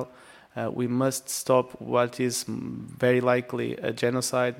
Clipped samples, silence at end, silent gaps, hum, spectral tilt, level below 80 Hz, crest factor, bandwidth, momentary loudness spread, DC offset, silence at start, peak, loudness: under 0.1%; 0 s; none; none; -4.5 dB/octave; -66 dBFS; 20 dB; 16.5 kHz; 10 LU; under 0.1%; 0 s; -8 dBFS; -26 LUFS